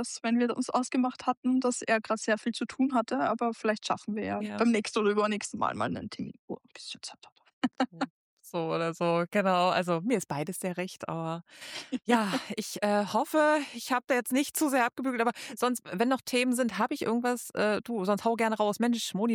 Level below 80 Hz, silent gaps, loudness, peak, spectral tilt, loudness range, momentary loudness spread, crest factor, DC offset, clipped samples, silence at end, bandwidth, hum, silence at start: -74 dBFS; 1.37-1.43 s, 6.39-6.48 s, 7.32-7.36 s, 7.53-7.62 s, 8.10-8.37 s; -29 LUFS; -10 dBFS; -4.5 dB/octave; 4 LU; 10 LU; 18 dB; under 0.1%; under 0.1%; 0 s; 19 kHz; none; 0 s